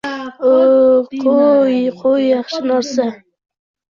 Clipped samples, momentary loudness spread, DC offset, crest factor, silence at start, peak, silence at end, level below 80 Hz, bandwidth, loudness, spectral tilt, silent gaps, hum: under 0.1%; 9 LU; under 0.1%; 12 dB; 0.05 s; -2 dBFS; 0.8 s; -60 dBFS; 7.2 kHz; -14 LUFS; -5 dB/octave; none; none